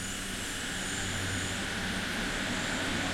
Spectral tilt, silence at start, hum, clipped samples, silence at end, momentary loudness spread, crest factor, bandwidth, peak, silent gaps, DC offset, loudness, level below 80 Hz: -2.5 dB/octave; 0 s; none; under 0.1%; 0 s; 3 LU; 14 dB; 16.5 kHz; -18 dBFS; none; under 0.1%; -32 LUFS; -46 dBFS